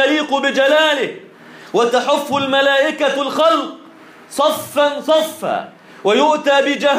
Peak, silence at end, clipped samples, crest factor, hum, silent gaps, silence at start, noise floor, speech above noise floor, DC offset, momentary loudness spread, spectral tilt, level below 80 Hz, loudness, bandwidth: -4 dBFS; 0 s; under 0.1%; 12 dB; none; none; 0 s; -41 dBFS; 26 dB; under 0.1%; 9 LU; -3 dB/octave; -68 dBFS; -15 LUFS; 15.5 kHz